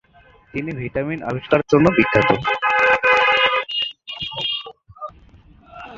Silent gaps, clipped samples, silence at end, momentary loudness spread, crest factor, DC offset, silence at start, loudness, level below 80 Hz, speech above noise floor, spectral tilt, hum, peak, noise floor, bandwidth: none; under 0.1%; 0 s; 22 LU; 20 dB; under 0.1%; 0.55 s; -18 LUFS; -48 dBFS; 33 dB; -5.5 dB/octave; none; 0 dBFS; -51 dBFS; 7.8 kHz